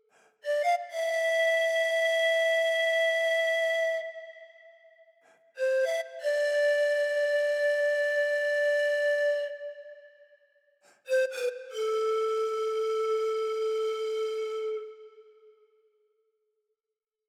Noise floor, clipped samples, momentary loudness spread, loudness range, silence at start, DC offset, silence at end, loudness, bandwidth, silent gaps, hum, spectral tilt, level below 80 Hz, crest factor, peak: -89 dBFS; under 0.1%; 9 LU; 7 LU; 0.45 s; under 0.1%; 2.05 s; -28 LUFS; 15 kHz; none; none; 2 dB/octave; under -90 dBFS; 12 dB; -18 dBFS